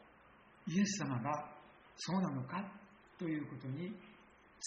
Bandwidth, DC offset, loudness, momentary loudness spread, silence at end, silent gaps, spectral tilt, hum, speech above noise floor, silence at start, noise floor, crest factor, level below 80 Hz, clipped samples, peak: 7.4 kHz; under 0.1%; -40 LUFS; 23 LU; 0 s; none; -5.5 dB/octave; none; 25 dB; 0 s; -64 dBFS; 18 dB; -76 dBFS; under 0.1%; -24 dBFS